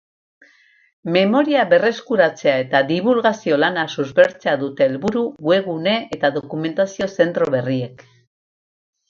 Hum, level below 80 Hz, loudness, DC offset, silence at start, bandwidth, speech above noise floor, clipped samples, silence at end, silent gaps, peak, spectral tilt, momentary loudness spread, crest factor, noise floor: none; -62 dBFS; -18 LUFS; under 0.1%; 1.05 s; 7.4 kHz; 36 dB; under 0.1%; 1.15 s; none; 0 dBFS; -6 dB/octave; 6 LU; 18 dB; -54 dBFS